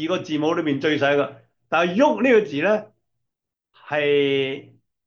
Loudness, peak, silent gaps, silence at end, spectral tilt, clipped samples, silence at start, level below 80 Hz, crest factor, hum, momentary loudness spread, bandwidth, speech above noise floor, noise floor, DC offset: -21 LUFS; -6 dBFS; none; 0.45 s; -6 dB/octave; under 0.1%; 0 s; -74 dBFS; 16 dB; none; 8 LU; 7 kHz; 62 dB; -82 dBFS; under 0.1%